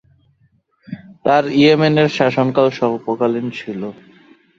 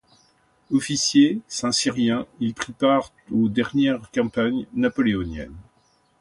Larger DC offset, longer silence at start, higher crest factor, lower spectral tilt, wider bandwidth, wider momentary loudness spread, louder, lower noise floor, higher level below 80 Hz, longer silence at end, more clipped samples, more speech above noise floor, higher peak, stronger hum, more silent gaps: neither; first, 0.9 s vs 0.7 s; about the same, 16 dB vs 18 dB; first, -7 dB/octave vs -4 dB/octave; second, 7.6 kHz vs 11.5 kHz; first, 18 LU vs 9 LU; first, -16 LUFS vs -22 LUFS; second, -59 dBFS vs -63 dBFS; second, -58 dBFS vs -50 dBFS; about the same, 0.65 s vs 0.6 s; neither; about the same, 44 dB vs 41 dB; first, -2 dBFS vs -6 dBFS; neither; neither